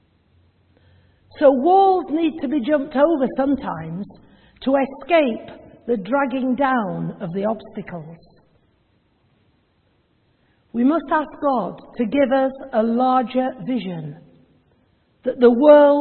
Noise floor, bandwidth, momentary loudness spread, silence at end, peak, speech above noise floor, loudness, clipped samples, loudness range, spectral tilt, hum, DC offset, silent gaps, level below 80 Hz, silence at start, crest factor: -63 dBFS; 4.4 kHz; 17 LU; 0 s; 0 dBFS; 44 dB; -19 LUFS; under 0.1%; 9 LU; -11 dB/octave; none; under 0.1%; none; -56 dBFS; 1.35 s; 20 dB